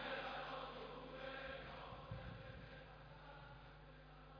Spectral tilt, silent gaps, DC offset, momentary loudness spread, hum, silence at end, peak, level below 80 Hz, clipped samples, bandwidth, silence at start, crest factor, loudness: -3 dB/octave; none; under 0.1%; 12 LU; none; 0 s; -34 dBFS; -64 dBFS; under 0.1%; 5.4 kHz; 0 s; 20 dB; -53 LUFS